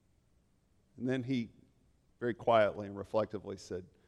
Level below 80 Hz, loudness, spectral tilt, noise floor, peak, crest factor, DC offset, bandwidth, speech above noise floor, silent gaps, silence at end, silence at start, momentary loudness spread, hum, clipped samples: -70 dBFS; -35 LUFS; -6.5 dB/octave; -72 dBFS; -14 dBFS; 22 dB; under 0.1%; 11 kHz; 38 dB; none; 0.2 s; 0.95 s; 15 LU; none; under 0.1%